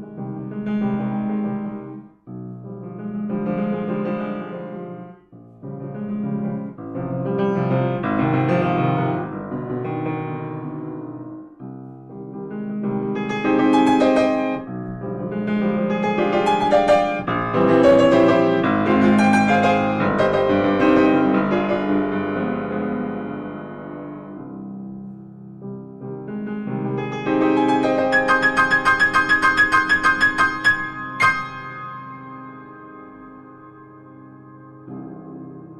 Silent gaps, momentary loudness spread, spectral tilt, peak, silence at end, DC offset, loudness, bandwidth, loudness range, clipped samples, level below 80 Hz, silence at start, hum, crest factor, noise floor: none; 21 LU; -6.5 dB/octave; -6 dBFS; 0 s; under 0.1%; -19 LUFS; 11.5 kHz; 14 LU; under 0.1%; -52 dBFS; 0 s; none; 16 dB; -45 dBFS